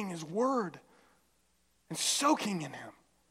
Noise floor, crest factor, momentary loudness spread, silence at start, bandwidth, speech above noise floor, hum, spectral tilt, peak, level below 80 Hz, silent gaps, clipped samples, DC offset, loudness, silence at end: -73 dBFS; 20 dB; 16 LU; 0 s; 16.5 kHz; 41 dB; none; -3 dB/octave; -16 dBFS; -80 dBFS; none; under 0.1%; under 0.1%; -32 LUFS; 0.4 s